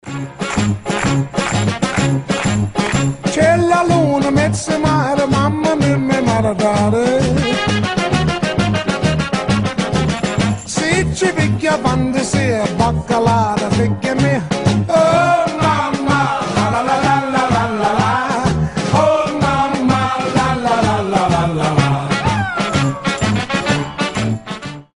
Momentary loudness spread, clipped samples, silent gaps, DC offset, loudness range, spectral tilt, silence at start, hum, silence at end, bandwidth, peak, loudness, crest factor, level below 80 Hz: 4 LU; under 0.1%; none; under 0.1%; 2 LU; -5.5 dB/octave; 0.05 s; none; 0.15 s; 11 kHz; 0 dBFS; -16 LUFS; 16 dB; -36 dBFS